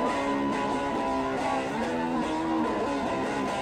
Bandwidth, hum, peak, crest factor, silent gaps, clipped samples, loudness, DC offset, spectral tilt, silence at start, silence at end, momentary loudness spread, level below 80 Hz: 13.5 kHz; none; -16 dBFS; 12 dB; none; under 0.1%; -28 LUFS; under 0.1%; -5 dB/octave; 0 s; 0 s; 1 LU; -52 dBFS